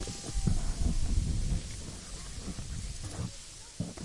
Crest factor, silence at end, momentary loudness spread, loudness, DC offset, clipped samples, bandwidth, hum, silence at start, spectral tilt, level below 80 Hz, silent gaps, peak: 18 dB; 0 s; 9 LU; -37 LUFS; under 0.1%; under 0.1%; 11.5 kHz; none; 0 s; -5 dB/octave; -36 dBFS; none; -14 dBFS